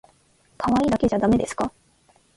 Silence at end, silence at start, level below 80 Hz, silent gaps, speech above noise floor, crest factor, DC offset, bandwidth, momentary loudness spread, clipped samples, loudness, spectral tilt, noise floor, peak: 0.7 s; 0.6 s; -46 dBFS; none; 39 dB; 16 dB; under 0.1%; 11.5 kHz; 9 LU; under 0.1%; -22 LUFS; -6.5 dB/octave; -60 dBFS; -8 dBFS